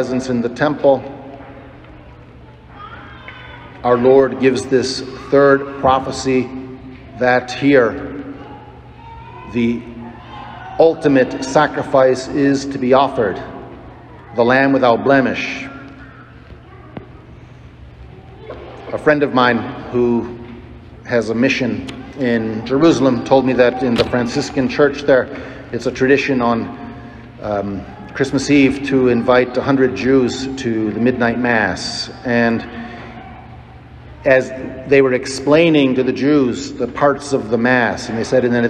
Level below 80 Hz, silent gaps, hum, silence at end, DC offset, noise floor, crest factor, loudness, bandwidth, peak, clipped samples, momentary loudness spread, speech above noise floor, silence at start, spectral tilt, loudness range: -44 dBFS; none; none; 0 s; under 0.1%; -40 dBFS; 16 dB; -15 LUFS; 9.8 kHz; 0 dBFS; under 0.1%; 21 LU; 25 dB; 0 s; -5.5 dB/octave; 5 LU